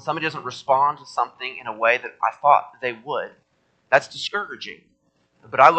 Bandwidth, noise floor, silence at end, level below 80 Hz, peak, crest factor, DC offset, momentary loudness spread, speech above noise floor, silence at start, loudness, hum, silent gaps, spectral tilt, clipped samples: 8.8 kHz; -66 dBFS; 0 s; -72 dBFS; 0 dBFS; 22 dB; under 0.1%; 13 LU; 44 dB; 0.05 s; -22 LUFS; none; none; -3.5 dB/octave; under 0.1%